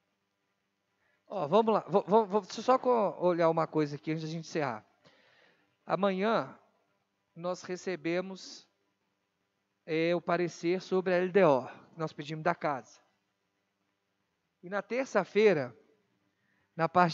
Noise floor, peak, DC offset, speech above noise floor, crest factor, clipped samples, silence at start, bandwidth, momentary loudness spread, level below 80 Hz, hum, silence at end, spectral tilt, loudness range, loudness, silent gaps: -80 dBFS; -10 dBFS; under 0.1%; 51 dB; 22 dB; under 0.1%; 1.3 s; 7.8 kHz; 14 LU; -88 dBFS; none; 0 s; -6.5 dB/octave; 8 LU; -30 LUFS; none